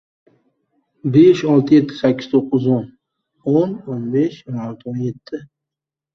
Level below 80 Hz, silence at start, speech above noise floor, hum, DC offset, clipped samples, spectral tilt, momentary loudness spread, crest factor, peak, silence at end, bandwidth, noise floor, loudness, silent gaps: -60 dBFS; 1.05 s; 70 dB; none; under 0.1%; under 0.1%; -8.5 dB/octave; 16 LU; 16 dB; -2 dBFS; 0.7 s; 6.4 kHz; -86 dBFS; -17 LUFS; none